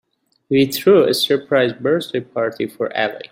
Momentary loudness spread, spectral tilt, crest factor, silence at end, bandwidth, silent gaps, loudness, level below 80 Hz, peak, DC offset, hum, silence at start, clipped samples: 10 LU; -5 dB/octave; 16 dB; 0.15 s; 16.5 kHz; none; -17 LUFS; -62 dBFS; 0 dBFS; under 0.1%; none; 0.5 s; under 0.1%